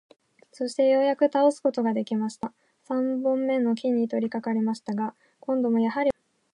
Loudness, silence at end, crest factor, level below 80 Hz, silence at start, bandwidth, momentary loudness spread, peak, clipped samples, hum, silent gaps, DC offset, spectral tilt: -25 LUFS; 0.45 s; 16 dB; -70 dBFS; 0.6 s; 11 kHz; 11 LU; -10 dBFS; under 0.1%; none; none; under 0.1%; -6.5 dB/octave